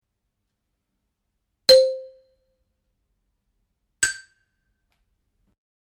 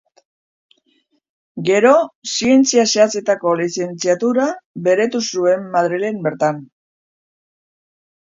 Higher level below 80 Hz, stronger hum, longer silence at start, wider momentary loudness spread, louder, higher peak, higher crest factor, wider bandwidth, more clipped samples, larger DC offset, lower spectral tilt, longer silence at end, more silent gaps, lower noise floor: about the same, -62 dBFS vs -66 dBFS; neither; first, 1.7 s vs 1.55 s; first, 20 LU vs 9 LU; about the same, -18 LUFS vs -16 LUFS; second, -4 dBFS vs 0 dBFS; first, 24 dB vs 18 dB; first, 15.5 kHz vs 7.8 kHz; neither; neither; second, 0.5 dB/octave vs -4 dB/octave; first, 1.8 s vs 1.6 s; second, none vs 2.15-2.22 s, 4.66-4.74 s; first, -78 dBFS vs -63 dBFS